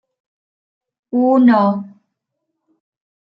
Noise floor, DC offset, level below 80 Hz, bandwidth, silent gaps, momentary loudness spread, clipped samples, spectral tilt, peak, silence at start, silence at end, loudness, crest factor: -76 dBFS; under 0.1%; -72 dBFS; 5.4 kHz; none; 12 LU; under 0.1%; -9.5 dB/octave; -2 dBFS; 1.15 s; 1.4 s; -14 LUFS; 16 dB